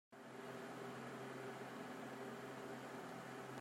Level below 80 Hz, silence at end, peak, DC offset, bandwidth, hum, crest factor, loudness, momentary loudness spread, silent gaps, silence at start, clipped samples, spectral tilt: -90 dBFS; 0 s; -38 dBFS; under 0.1%; 16 kHz; none; 14 dB; -51 LUFS; 1 LU; none; 0.1 s; under 0.1%; -5 dB/octave